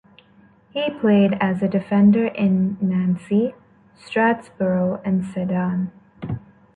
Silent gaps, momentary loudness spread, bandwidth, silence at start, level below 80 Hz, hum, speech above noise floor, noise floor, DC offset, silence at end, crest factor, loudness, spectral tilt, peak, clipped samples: none; 15 LU; 4.6 kHz; 0.75 s; -56 dBFS; none; 34 dB; -53 dBFS; under 0.1%; 0.4 s; 14 dB; -20 LUFS; -9 dB/octave; -6 dBFS; under 0.1%